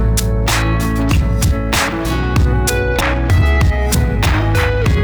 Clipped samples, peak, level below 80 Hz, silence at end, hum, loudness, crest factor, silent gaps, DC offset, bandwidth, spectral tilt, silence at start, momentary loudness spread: under 0.1%; -2 dBFS; -18 dBFS; 0 s; none; -15 LUFS; 12 dB; none; under 0.1%; over 20 kHz; -5 dB/octave; 0 s; 3 LU